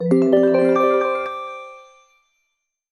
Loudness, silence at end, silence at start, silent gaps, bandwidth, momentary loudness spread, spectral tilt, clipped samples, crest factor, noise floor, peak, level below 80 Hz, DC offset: -17 LUFS; 1.1 s; 0 s; none; 10.5 kHz; 19 LU; -8 dB/octave; under 0.1%; 16 dB; -75 dBFS; -2 dBFS; -66 dBFS; under 0.1%